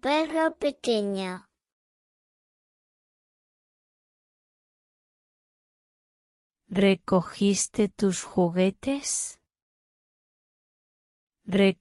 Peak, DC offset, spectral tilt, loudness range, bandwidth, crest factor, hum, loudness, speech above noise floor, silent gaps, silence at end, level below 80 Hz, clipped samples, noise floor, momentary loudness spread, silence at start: -10 dBFS; under 0.1%; -4.5 dB/octave; 9 LU; 12 kHz; 20 dB; none; -26 LUFS; over 65 dB; 1.73-6.50 s, 9.62-11.27 s; 0.05 s; -62 dBFS; under 0.1%; under -90 dBFS; 8 LU; 0.05 s